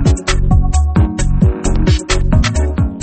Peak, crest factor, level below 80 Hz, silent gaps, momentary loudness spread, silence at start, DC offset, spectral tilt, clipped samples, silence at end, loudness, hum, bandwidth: 0 dBFS; 12 dB; -14 dBFS; none; 2 LU; 0 s; under 0.1%; -5.5 dB/octave; under 0.1%; 0 s; -14 LUFS; none; 8.8 kHz